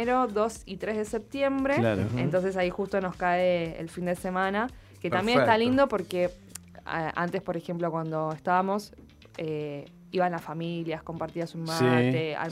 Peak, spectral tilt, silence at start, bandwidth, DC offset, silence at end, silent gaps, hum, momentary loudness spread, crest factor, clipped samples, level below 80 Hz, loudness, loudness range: -8 dBFS; -6 dB/octave; 0 s; 16 kHz; under 0.1%; 0 s; none; none; 12 LU; 20 dB; under 0.1%; -56 dBFS; -28 LUFS; 5 LU